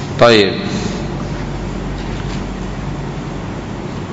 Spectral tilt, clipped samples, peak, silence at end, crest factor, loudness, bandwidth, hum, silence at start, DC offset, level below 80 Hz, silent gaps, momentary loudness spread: -5.5 dB/octave; under 0.1%; 0 dBFS; 0 s; 18 dB; -18 LUFS; 8.6 kHz; none; 0 s; under 0.1%; -30 dBFS; none; 15 LU